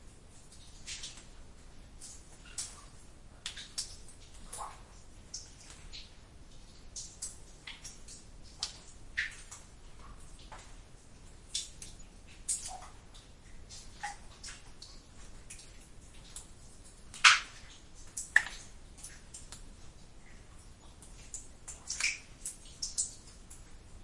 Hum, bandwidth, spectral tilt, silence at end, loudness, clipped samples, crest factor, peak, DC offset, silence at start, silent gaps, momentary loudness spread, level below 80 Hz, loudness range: none; 11.5 kHz; 0.5 dB/octave; 0 s; -35 LUFS; under 0.1%; 36 dB; -4 dBFS; under 0.1%; 0 s; none; 22 LU; -54 dBFS; 18 LU